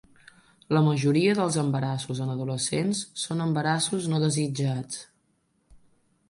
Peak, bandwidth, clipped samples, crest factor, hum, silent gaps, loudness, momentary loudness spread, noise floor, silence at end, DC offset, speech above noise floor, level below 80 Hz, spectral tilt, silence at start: -12 dBFS; 11.5 kHz; under 0.1%; 16 dB; none; none; -26 LUFS; 8 LU; -70 dBFS; 0.5 s; under 0.1%; 45 dB; -64 dBFS; -5 dB/octave; 0.7 s